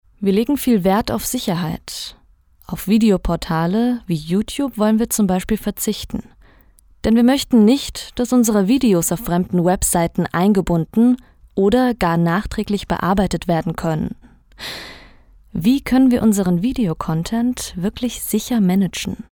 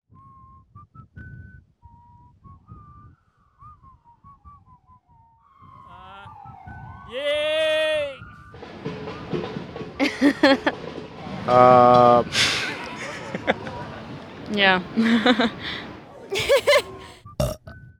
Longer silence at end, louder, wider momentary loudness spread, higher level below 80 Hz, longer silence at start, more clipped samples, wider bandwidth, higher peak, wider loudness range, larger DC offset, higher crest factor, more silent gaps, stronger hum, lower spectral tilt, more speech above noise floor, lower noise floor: about the same, 0.1 s vs 0.2 s; about the same, -18 LUFS vs -20 LUFS; second, 12 LU vs 25 LU; first, -38 dBFS vs -50 dBFS; second, 0.2 s vs 0.75 s; neither; about the same, over 20 kHz vs 19.5 kHz; second, -4 dBFS vs 0 dBFS; second, 4 LU vs 9 LU; neither; second, 14 dB vs 24 dB; neither; neither; about the same, -5.5 dB/octave vs -4.5 dB/octave; second, 35 dB vs 43 dB; second, -52 dBFS vs -59 dBFS